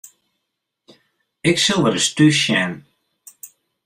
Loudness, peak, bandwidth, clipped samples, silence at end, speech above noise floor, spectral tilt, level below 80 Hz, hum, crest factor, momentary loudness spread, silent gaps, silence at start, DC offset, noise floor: -16 LUFS; -2 dBFS; 16 kHz; under 0.1%; 0.4 s; 61 dB; -3.5 dB/octave; -58 dBFS; none; 18 dB; 23 LU; none; 1.45 s; under 0.1%; -78 dBFS